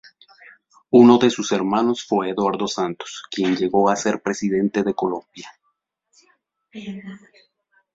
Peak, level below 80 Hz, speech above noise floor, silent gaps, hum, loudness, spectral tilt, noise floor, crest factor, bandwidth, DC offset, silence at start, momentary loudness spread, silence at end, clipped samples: -2 dBFS; -62 dBFS; 53 dB; none; none; -19 LUFS; -5 dB/octave; -72 dBFS; 20 dB; 7.8 kHz; under 0.1%; 0.9 s; 21 LU; 0.75 s; under 0.1%